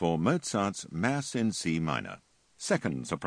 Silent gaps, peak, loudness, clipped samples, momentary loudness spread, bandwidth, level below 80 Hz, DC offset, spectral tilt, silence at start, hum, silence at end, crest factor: none; -10 dBFS; -31 LUFS; under 0.1%; 8 LU; 10.5 kHz; -60 dBFS; under 0.1%; -5 dB/octave; 0 s; none; 0 s; 20 dB